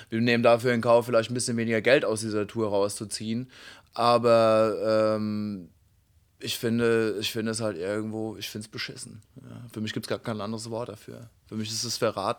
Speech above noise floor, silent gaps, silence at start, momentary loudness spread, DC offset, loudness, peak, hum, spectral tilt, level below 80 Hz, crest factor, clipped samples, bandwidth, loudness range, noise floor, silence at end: 37 dB; none; 0 s; 17 LU; under 0.1%; -26 LUFS; -6 dBFS; none; -4.5 dB/octave; -66 dBFS; 20 dB; under 0.1%; 20 kHz; 10 LU; -64 dBFS; 0.05 s